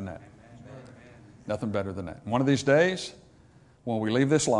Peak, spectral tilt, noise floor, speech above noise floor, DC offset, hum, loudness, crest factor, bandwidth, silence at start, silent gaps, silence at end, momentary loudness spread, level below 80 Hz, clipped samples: -10 dBFS; -5.5 dB/octave; -57 dBFS; 31 dB; under 0.1%; none; -27 LUFS; 18 dB; 11 kHz; 0 s; none; 0 s; 24 LU; -62 dBFS; under 0.1%